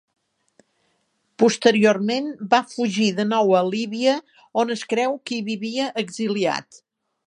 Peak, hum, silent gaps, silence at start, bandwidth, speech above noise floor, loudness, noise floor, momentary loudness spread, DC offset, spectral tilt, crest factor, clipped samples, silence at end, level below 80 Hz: -2 dBFS; none; none; 1.4 s; 10.5 kHz; 48 dB; -21 LUFS; -69 dBFS; 9 LU; under 0.1%; -4.5 dB/octave; 20 dB; under 0.1%; 0.5 s; -74 dBFS